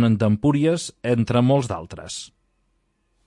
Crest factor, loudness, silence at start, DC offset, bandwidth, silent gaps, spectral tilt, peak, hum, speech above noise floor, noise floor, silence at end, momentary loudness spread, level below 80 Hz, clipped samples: 16 dB; -21 LUFS; 0 s; under 0.1%; 11.5 kHz; none; -6.5 dB/octave; -6 dBFS; none; 48 dB; -68 dBFS; 1 s; 15 LU; -54 dBFS; under 0.1%